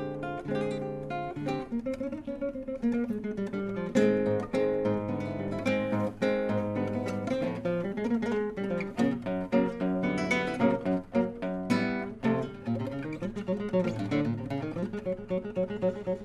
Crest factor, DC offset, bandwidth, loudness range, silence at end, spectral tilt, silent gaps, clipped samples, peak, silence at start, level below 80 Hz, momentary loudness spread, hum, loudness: 18 dB; under 0.1%; 12 kHz; 3 LU; 0 s; -7.5 dB/octave; none; under 0.1%; -12 dBFS; 0 s; -56 dBFS; 7 LU; none; -31 LUFS